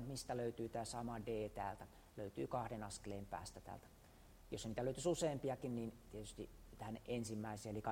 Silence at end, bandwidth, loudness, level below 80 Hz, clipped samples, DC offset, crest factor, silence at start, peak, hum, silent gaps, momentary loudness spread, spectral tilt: 0 s; 16 kHz; -46 LUFS; -64 dBFS; under 0.1%; under 0.1%; 18 dB; 0 s; -28 dBFS; none; none; 15 LU; -5.5 dB/octave